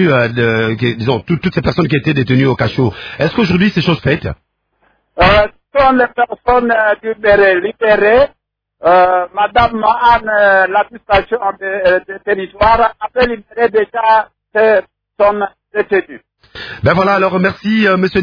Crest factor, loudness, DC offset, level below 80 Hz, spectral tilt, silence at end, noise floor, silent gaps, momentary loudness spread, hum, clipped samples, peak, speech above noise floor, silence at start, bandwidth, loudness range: 12 dB; -12 LUFS; under 0.1%; -36 dBFS; -8 dB/octave; 0 s; -59 dBFS; none; 8 LU; none; under 0.1%; 0 dBFS; 47 dB; 0 s; 5.4 kHz; 3 LU